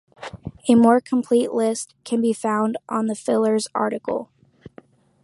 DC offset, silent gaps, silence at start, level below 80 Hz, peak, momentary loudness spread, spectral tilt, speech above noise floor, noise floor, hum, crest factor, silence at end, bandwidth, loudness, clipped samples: under 0.1%; none; 0.2 s; -58 dBFS; -4 dBFS; 13 LU; -5.5 dB/octave; 30 dB; -50 dBFS; none; 18 dB; 0.55 s; 11.5 kHz; -21 LUFS; under 0.1%